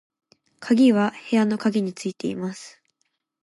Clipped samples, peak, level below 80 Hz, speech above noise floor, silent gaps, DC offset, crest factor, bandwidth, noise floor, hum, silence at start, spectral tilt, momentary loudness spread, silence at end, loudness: under 0.1%; -8 dBFS; -72 dBFS; 53 dB; none; under 0.1%; 16 dB; 11.5 kHz; -75 dBFS; none; 0.6 s; -6 dB/octave; 15 LU; 0.75 s; -22 LUFS